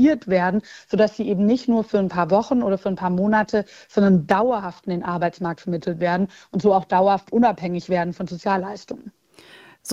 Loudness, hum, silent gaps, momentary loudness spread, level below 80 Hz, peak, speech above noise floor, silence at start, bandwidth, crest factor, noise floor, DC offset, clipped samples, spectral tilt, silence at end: -21 LUFS; none; none; 10 LU; -56 dBFS; -2 dBFS; 28 dB; 0 s; 11 kHz; 20 dB; -48 dBFS; under 0.1%; under 0.1%; -7 dB/octave; 0 s